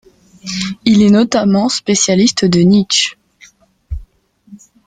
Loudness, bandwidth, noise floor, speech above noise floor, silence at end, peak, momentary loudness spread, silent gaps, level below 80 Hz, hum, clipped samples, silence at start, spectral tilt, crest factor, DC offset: -12 LUFS; 9.4 kHz; -46 dBFS; 35 dB; 0.3 s; 0 dBFS; 20 LU; none; -38 dBFS; none; under 0.1%; 0.45 s; -4.5 dB/octave; 14 dB; under 0.1%